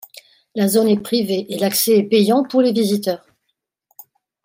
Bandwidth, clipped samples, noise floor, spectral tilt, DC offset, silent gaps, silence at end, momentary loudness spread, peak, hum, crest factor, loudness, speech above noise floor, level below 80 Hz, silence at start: 16.5 kHz; under 0.1%; -74 dBFS; -5 dB/octave; under 0.1%; none; 1.3 s; 8 LU; -4 dBFS; none; 14 dB; -17 LUFS; 58 dB; -68 dBFS; 0.55 s